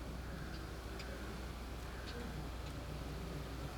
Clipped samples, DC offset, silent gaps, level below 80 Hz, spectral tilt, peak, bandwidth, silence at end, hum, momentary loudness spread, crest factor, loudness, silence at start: under 0.1%; under 0.1%; none; -48 dBFS; -5.5 dB/octave; -32 dBFS; over 20 kHz; 0 s; none; 2 LU; 12 dB; -47 LUFS; 0 s